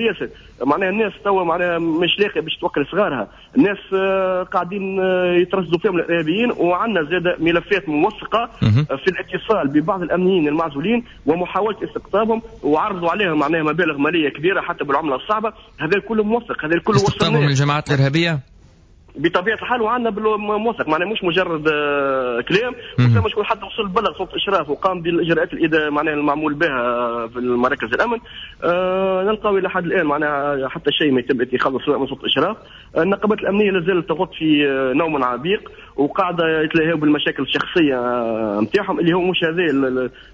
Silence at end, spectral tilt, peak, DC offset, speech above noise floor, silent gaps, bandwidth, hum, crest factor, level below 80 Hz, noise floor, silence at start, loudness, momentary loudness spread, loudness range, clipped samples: 0.1 s; -6.5 dB/octave; -4 dBFS; under 0.1%; 29 dB; none; 8 kHz; none; 14 dB; -46 dBFS; -48 dBFS; 0 s; -19 LUFS; 5 LU; 1 LU; under 0.1%